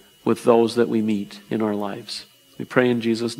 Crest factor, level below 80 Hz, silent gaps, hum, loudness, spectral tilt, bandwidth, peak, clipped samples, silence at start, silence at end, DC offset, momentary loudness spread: 22 dB; -68 dBFS; none; none; -22 LUFS; -6 dB/octave; 16 kHz; 0 dBFS; under 0.1%; 0.25 s; 0 s; under 0.1%; 14 LU